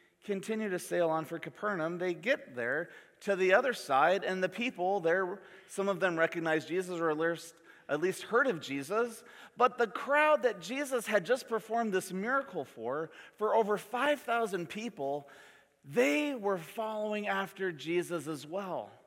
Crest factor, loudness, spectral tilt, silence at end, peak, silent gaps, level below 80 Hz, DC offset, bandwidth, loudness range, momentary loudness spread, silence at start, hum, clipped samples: 22 dB; -32 LUFS; -4.5 dB/octave; 0.15 s; -12 dBFS; none; -86 dBFS; under 0.1%; 16.5 kHz; 3 LU; 11 LU; 0.25 s; none; under 0.1%